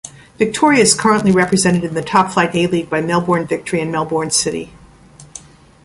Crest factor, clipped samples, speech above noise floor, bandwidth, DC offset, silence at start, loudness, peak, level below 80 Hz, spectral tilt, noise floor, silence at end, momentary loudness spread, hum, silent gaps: 16 dB; under 0.1%; 27 dB; 11.5 kHz; under 0.1%; 0.05 s; -15 LUFS; 0 dBFS; -48 dBFS; -4 dB/octave; -42 dBFS; 0.45 s; 23 LU; none; none